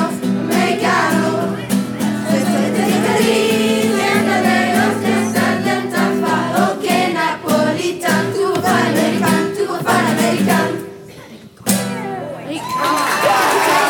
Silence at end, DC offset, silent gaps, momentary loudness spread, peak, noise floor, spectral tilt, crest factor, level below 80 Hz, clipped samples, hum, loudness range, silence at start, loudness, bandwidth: 0 s; under 0.1%; none; 6 LU; -2 dBFS; -37 dBFS; -4.5 dB/octave; 14 dB; -58 dBFS; under 0.1%; none; 3 LU; 0 s; -16 LUFS; 19 kHz